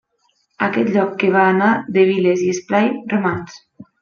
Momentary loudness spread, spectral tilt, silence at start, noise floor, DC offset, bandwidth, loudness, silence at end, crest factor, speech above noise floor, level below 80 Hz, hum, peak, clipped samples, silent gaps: 8 LU; -6 dB/octave; 0.6 s; -64 dBFS; under 0.1%; 7 kHz; -17 LUFS; 0.2 s; 16 dB; 48 dB; -60 dBFS; none; -2 dBFS; under 0.1%; none